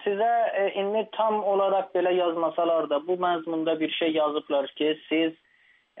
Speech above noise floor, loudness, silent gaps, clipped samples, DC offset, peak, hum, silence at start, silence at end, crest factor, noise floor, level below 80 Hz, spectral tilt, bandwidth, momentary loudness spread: 37 dB; -26 LUFS; none; under 0.1%; under 0.1%; -12 dBFS; none; 0 s; 0 s; 12 dB; -63 dBFS; -84 dBFS; -2.5 dB/octave; 3.9 kHz; 4 LU